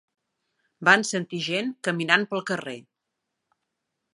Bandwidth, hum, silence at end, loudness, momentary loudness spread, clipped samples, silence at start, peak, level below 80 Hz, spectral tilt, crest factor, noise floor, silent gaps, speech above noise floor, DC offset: 11.5 kHz; none; 1.35 s; -23 LUFS; 12 LU; under 0.1%; 0.8 s; -2 dBFS; -80 dBFS; -3.5 dB/octave; 26 dB; -82 dBFS; none; 58 dB; under 0.1%